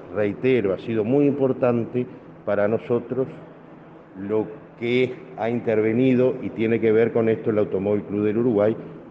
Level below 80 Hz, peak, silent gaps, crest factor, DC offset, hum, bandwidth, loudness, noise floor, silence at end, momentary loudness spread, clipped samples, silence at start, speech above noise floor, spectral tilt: -64 dBFS; -6 dBFS; none; 16 dB; under 0.1%; none; 5.8 kHz; -22 LUFS; -44 dBFS; 0 s; 10 LU; under 0.1%; 0 s; 23 dB; -9.5 dB/octave